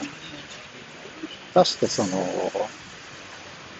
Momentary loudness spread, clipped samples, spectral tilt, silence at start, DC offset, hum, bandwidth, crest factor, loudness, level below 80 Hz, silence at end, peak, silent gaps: 19 LU; under 0.1%; -4 dB/octave; 0 s; under 0.1%; none; 8.4 kHz; 22 dB; -24 LUFS; -62 dBFS; 0 s; -4 dBFS; none